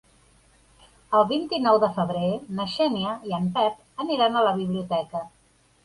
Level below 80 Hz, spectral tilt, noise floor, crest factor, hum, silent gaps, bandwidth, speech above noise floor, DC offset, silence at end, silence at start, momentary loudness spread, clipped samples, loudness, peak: -62 dBFS; -7 dB/octave; -58 dBFS; 18 dB; none; none; 11.5 kHz; 35 dB; under 0.1%; 0.55 s; 1.1 s; 9 LU; under 0.1%; -24 LUFS; -6 dBFS